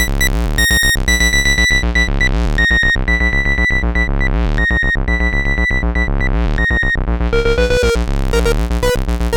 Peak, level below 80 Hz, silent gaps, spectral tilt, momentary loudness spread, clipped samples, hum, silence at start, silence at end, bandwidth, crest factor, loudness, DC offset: -2 dBFS; -16 dBFS; none; -4 dB/octave; 6 LU; under 0.1%; none; 0 s; 0 s; over 20 kHz; 12 dB; -14 LUFS; under 0.1%